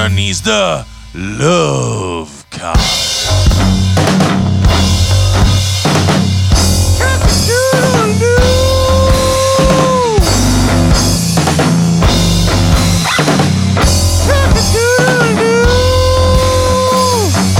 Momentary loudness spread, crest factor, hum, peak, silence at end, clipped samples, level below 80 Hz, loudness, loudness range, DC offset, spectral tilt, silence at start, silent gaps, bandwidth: 3 LU; 10 dB; none; 0 dBFS; 0 s; under 0.1%; -18 dBFS; -10 LUFS; 2 LU; under 0.1%; -4.5 dB/octave; 0 s; none; 16.5 kHz